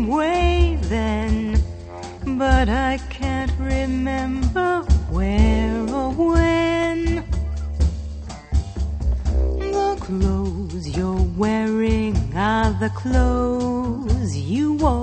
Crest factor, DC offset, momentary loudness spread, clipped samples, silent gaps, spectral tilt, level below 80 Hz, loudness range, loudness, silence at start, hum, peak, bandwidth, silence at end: 18 dB; under 0.1%; 8 LU; under 0.1%; none; -7 dB/octave; -24 dBFS; 4 LU; -21 LUFS; 0 s; none; -2 dBFS; 8.6 kHz; 0 s